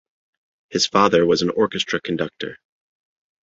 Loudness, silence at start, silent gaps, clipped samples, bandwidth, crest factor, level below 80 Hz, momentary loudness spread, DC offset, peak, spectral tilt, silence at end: -19 LUFS; 0.7 s; none; under 0.1%; 8 kHz; 20 dB; -56 dBFS; 12 LU; under 0.1%; -2 dBFS; -4 dB/octave; 0.9 s